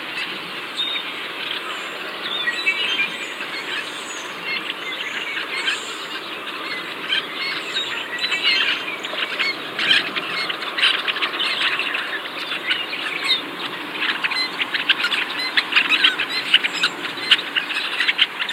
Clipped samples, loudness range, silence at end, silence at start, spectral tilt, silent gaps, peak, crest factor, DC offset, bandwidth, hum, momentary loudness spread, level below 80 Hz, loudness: under 0.1%; 7 LU; 0 s; 0 s; -0.5 dB/octave; none; 0 dBFS; 22 dB; under 0.1%; 16 kHz; none; 11 LU; -74 dBFS; -20 LUFS